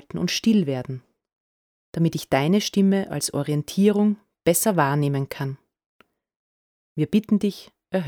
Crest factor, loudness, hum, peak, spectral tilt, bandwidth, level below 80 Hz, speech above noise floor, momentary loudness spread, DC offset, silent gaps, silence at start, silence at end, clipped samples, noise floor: 18 dB; -22 LUFS; none; -6 dBFS; -5.5 dB/octave; 19.5 kHz; -60 dBFS; over 69 dB; 12 LU; under 0.1%; 1.33-1.93 s, 5.86-6.00 s, 6.36-6.96 s; 0.15 s; 0 s; under 0.1%; under -90 dBFS